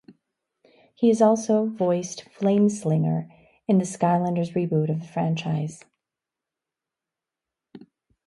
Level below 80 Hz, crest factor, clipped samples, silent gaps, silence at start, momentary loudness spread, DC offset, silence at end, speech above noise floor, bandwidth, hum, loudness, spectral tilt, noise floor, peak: -68 dBFS; 18 dB; under 0.1%; none; 1 s; 10 LU; under 0.1%; 0.5 s; 66 dB; 11.5 kHz; none; -23 LUFS; -7 dB/octave; -88 dBFS; -6 dBFS